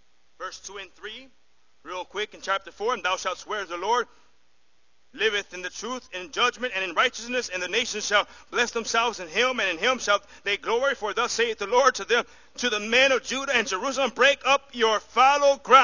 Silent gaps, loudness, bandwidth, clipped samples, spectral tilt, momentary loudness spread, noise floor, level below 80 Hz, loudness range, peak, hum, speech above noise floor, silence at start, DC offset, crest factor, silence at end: none; -24 LUFS; 7.4 kHz; under 0.1%; -1 dB/octave; 16 LU; -69 dBFS; -62 dBFS; 7 LU; -2 dBFS; none; 44 dB; 0.4 s; 0.2%; 24 dB; 0 s